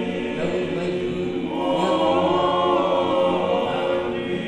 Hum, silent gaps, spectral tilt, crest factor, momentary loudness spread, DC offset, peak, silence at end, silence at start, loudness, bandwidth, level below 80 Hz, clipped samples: none; none; -6.5 dB/octave; 14 dB; 6 LU; under 0.1%; -8 dBFS; 0 s; 0 s; -22 LUFS; 9.8 kHz; -54 dBFS; under 0.1%